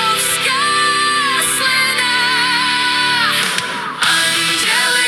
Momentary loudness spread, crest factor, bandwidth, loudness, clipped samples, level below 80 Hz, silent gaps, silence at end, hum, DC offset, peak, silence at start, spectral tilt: 2 LU; 14 dB; 17.5 kHz; -13 LUFS; under 0.1%; -58 dBFS; none; 0 s; none; under 0.1%; 0 dBFS; 0 s; 0 dB/octave